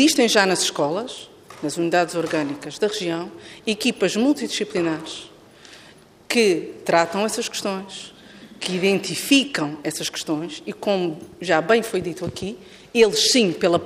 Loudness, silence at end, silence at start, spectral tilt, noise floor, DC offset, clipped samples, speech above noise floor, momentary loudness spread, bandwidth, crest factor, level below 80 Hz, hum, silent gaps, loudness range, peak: -21 LUFS; 0 s; 0 s; -3.5 dB/octave; -49 dBFS; under 0.1%; under 0.1%; 27 dB; 15 LU; 15.5 kHz; 20 dB; -60 dBFS; none; none; 3 LU; -2 dBFS